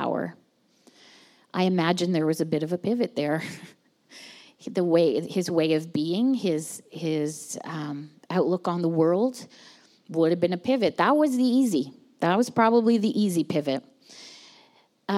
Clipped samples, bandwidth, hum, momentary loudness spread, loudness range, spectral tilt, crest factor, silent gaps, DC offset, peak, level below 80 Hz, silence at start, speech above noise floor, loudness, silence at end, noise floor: under 0.1%; 15.5 kHz; none; 17 LU; 5 LU; -6 dB/octave; 18 dB; none; under 0.1%; -6 dBFS; -80 dBFS; 0 s; 39 dB; -25 LUFS; 0 s; -63 dBFS